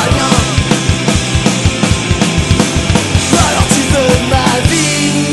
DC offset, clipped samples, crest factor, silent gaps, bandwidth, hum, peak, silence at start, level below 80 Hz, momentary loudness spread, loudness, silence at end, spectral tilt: 0.8%; 0.3%; 10 dB; none; 12.5 kHz; none; 0 dBFS; 0 s; -22 dBFS; 2 LU; -11 LUFS; 0 s; -4 dB/octave